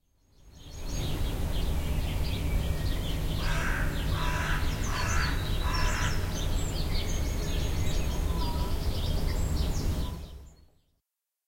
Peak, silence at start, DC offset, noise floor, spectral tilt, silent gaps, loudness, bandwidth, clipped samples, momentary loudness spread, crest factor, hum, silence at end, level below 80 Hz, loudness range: -14 dBFS; 0.45 s; under 0.1%; -84 dBFS; -4.5 dB/octave; none; -32 LUFS; 16.5 kHz; under 0.1%; 5 LU; 14 dB; none; 1 s; -32 dBFS; 3 LU